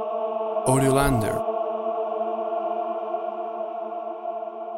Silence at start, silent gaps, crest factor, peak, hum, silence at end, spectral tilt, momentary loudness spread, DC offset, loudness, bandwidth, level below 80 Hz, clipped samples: 0 s; none; 20 dB; -6 dBFS; none; 0 s; -6 dB/octave; 11 LU; under 0.1%; -26 LUFS; 16.5 kHz; -44 dBFS; under 0.1%